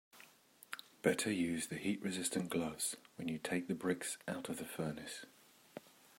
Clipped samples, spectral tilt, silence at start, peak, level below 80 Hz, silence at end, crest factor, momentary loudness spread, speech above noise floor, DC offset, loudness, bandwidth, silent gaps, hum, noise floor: under 0.1%; -4 dB/octave; 0.15 s; -18 dBFS; -76 dBFS; 0.3 s; 24 dB; 19 LU; 24 dB; under 0.1%; -40 LUFS; 16 kHz; none; none; -64 dBFS